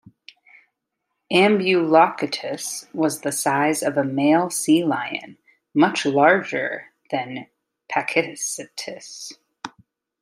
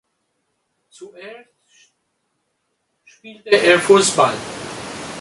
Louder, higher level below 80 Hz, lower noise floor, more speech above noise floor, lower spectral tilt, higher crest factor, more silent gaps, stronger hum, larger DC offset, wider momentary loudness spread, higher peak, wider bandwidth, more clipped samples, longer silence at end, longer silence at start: second, -20 LUFS vs -16 LUFS; second, -72 dBFS vs -58 dBFS; first, -79 dBFS vs -71 dBFS; first, 58 dB vs 54 dB; about the same, -4 dB/octave vs -3 dB/octave; about the same, 20 dB vs 20 dB; neither; neither; neither; second, 18 LU vs 26 LU; about the same, -2 dBFS vs 0 dBFS; first, 15.5 kHz vs 11.5 kHz; neither; first, 0.55 s vs 0 s; first, 1.3 s vs 1 s